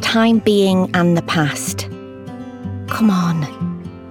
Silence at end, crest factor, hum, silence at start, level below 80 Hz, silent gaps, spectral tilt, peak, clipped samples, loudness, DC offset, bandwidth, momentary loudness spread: 0 s; 14 dB; none; 0 s; -54 dBFS; none; -5.5 dB/octave; -2 dBFS; under 0.1%; -17 LUFS; under 0.1%; 18 kHz; 17 LU